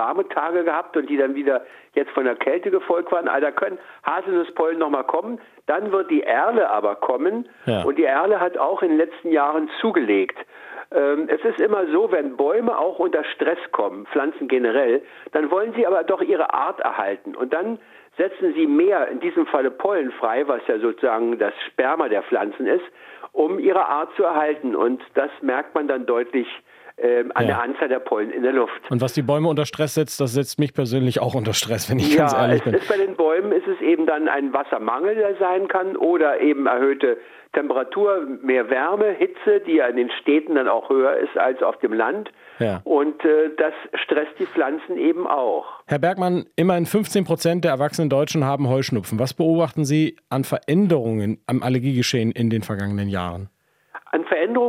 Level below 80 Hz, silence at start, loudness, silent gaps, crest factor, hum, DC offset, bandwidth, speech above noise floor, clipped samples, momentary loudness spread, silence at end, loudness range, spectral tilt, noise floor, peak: -68 dBFS; 0 s; -21 LUFS; none; 18 dB; none; under 0.1%; 16 kHz; 22 dB; under 0.1%; 6 LU; 0 s; 3 LU; -6 dB/octave; -43 dBFS; -2 dBFS